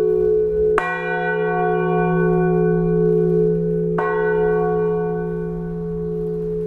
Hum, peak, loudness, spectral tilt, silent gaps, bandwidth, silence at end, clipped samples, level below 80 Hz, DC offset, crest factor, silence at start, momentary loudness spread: none; -2 dBFS; -19 LUFS; -9.5 dB/octave; none; 4.1 kHz; 0 s; under 0.1%; -40 dBFS; under 0.1%; 16 dB; 0 s; 8 LU